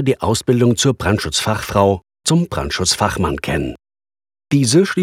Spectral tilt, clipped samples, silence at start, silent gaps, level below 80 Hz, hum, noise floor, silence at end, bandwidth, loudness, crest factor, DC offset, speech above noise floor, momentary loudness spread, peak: -4.5 dB/octave; under 0.1%; 0 s; none; -38 dBFS; none; under -90 dBFS; 0 s; 16.5 kHz; -17 LUFS; 16 dB; under 0.1%; over 74 dB; 7 LU; 0 dBFS